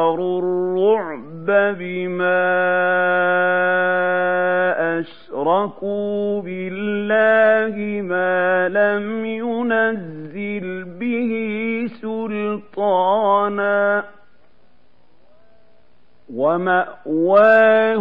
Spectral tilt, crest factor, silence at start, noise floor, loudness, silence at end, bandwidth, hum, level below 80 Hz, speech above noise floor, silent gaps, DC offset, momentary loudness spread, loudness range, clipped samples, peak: -8.5 dB/octave; 16 dB; 0 s; -59 dBFS; -18 LUFS; 0 s; 5 kHz; none; -68 dBFS; 41 dB; none; 0.7%; 12 LU; 5 LU; under 0.1%; -2 dBFS